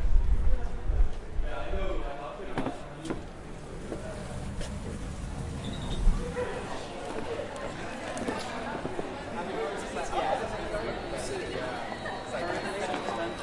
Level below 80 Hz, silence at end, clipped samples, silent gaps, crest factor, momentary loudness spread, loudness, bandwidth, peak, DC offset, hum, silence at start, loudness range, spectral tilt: -34 dBFS; 0 s; under 0.1%; none; 22 dB; 7 LU; -35 LUFS; 11.5 kHz; -8 dBFS; under 0.1%; none; 0 s; 5 LU; -5.5 dB/octave